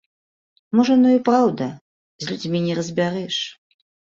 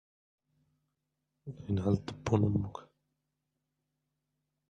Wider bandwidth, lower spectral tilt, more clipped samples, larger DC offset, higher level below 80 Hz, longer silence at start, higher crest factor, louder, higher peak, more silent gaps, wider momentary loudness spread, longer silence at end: about the same, 7.6 kHz vs 7.8 kHz; second, -6 dB/octave vs -8.5 dB/octave; neither; neither; about the same, -64 dBFS vs -62 dBFS; second, 0.75 s vs 1.45 s; about the same, 18 dB vs 22 dB; first, -20 LUFS vs -33 LUFS; first, -4 dBFS vs -14 dBFS; first, 1.81-2.19 s vs none; second, 14 LU vs 20 LU; second, 0.6 s vs 1.85 s